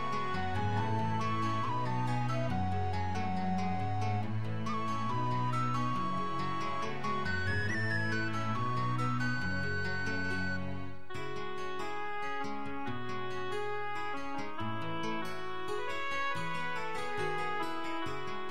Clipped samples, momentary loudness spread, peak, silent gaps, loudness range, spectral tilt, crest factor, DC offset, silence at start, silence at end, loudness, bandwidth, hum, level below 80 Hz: under 0.1%; 6 LU; -20 dBFS; none; 5 LU; -6 dB/octave; 14 dB; 2%; 0 s; 0 s; -35 LUFS; 13 kHz; none; -62 dBFS